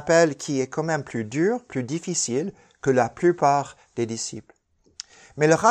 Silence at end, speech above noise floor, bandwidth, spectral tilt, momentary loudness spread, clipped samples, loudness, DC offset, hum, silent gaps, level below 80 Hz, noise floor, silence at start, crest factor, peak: 0 s; 22 dB; 10 kHz; -4.5 dB/octave; 15 LU; under 0.1%; -24 LUFS; under 0.1%; none; none; -62 dBFS; -45 dBFS; 0 s; 20 dB; -4 dBFS